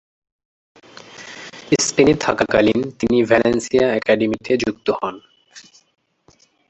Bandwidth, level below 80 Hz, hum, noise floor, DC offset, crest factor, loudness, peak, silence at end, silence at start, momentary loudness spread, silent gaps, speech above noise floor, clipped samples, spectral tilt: 8.4 kHz; -50 dBFS; none; -56 dBFS; under 0.1%; 20 dB; -17 LUFS; 0 dBFS; 1.1 s; 1.15 s; 19 LU; none; 39 dB; under 0.1%; -4.5 dB/octave